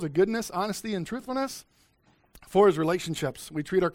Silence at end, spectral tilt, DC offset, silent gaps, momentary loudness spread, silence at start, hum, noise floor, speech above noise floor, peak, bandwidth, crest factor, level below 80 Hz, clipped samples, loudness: 0.05 s; -5.5 dB/octave; under 0.1%; none; 11 LU; 0 s; none; -65 dBFS; 38 dB; -8 dBFS; 16.5 kHz; 20 dB; -58 dBFS; under 0.1%; -27 LUFS